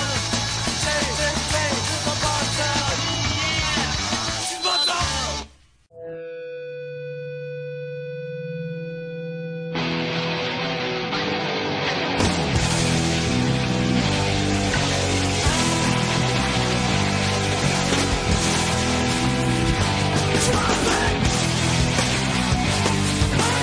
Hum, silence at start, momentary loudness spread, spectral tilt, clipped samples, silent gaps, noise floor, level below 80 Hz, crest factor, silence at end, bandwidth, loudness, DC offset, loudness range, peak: none; 0 s; 12 LU; -4 dB/octave; under 0.1%; none; -52 dBFS; -36 dBFS; 14 dB; 0 s; 10.5 kHz; -21 LUFS; under 0.1%; 9 LU; -8 dBFS